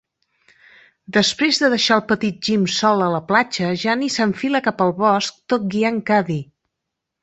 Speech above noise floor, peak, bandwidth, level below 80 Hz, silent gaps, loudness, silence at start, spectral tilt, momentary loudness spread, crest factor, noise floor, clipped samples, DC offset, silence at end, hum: 62 dB; -2 dBFS; 8.2 kHz; -60 dBFS; none; -18 LUFS; 1.1 s; -4 dB/octave; 5 LU; 18 dB; -80 dBFS; under 0.1%; under 0.1%; 0.8 s; none